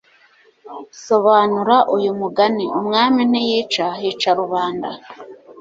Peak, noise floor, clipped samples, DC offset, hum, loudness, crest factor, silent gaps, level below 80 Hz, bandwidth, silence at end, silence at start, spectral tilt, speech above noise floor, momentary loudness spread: -2 dBFS; -53 dBFS; under 0.1%; under 0.1%; none; -17 LUFS; 16 dB; none; -64 dBFS; 7.8 kHz; 0 s; 0.65 s; -5 dB/octave; 36 dB; 21 LU